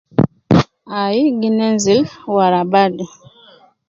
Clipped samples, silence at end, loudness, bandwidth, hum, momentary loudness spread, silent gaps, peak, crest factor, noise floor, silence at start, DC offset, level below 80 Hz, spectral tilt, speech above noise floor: under 0.1%; 0.8 s; -15 LUFS; 7.8 kHz; none; 8 LU; none; 0 dBFS; 16 dB; -47 dBFS; 0.2 s; under 0.1%; -46 dBFS; -6 dB/octave; 32 dB